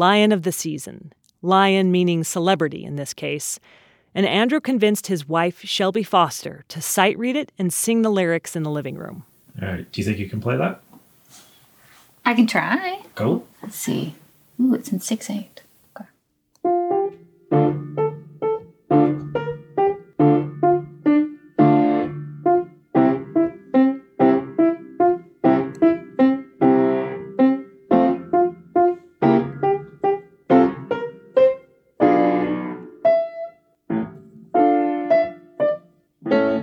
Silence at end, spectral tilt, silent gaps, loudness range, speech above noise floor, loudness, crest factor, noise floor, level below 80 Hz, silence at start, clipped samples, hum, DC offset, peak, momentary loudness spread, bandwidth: 0 s; -5.5 dB/octave; none; 5 LU; 44 dB; -20 LUFS; 20 dB; -65 dBFS; -62 dBFS; 0 s; under 0.1%; none; under 0.1%; -2 dBFS; 11 LU; 19.5 kHz